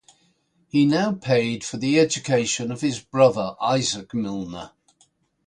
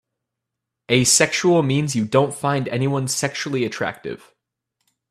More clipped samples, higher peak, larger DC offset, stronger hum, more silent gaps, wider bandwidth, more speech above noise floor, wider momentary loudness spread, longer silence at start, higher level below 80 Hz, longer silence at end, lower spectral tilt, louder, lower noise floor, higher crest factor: neither; second, -4 dBFS vs 0 dBFS; neither; neither; neither; second, 11 kHz vs 15 kHz; second, 43 dB vs 63 dB; about the same, 10 LU vs 12 LU; second, 0.75 s vs 0.9 s; about the same, -60 dBFS vs -60 dBFS; second, 0.8 s vs 0.95 s; about the same, -4.5 dB/octave vs -4 dB/octave; second, -22 LUFS vs -19 LUFS; second, -65 dBFS vs -82 dBFS; about the same, 18 dB vs 20 dB